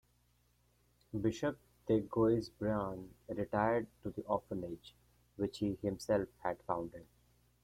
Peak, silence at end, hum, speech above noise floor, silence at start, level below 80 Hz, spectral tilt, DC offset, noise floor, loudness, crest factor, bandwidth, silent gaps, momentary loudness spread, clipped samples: -18 dBFS; 0.6 s; 60 Hz at -60 dBFS; 37 dB; 1.15 s; -62 dBFS; -7 dB/octave; under 0.1%; -73 dBFS; -37 LUFS; 20 dB; 15 kHz; none; 13 LU; under 0.1%